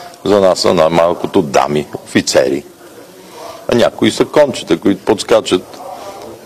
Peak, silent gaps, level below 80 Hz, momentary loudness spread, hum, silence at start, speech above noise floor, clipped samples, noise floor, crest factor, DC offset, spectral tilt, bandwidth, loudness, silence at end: 0 dBFS; none; -48 dBFS; 18 LU; none; 0 s; 24 dB; under 0.1%; -36 dBFS; 14 dB; under 0.1%; -4.5 dB/octave; 15 kHz; -13 LUFS; 0 s